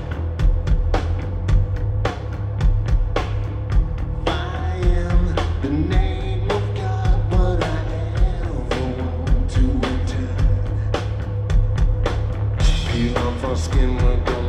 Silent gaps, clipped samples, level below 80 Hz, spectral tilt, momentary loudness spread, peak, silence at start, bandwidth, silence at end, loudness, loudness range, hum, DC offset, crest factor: none; under 0.1%; -20 dBFS; -7 dB/octave; 5 LU; -4 dBFS; 0 s; 9 kHz; 0 s; -22 LUFS; 1 LU; none; under 0.1%; 14 dB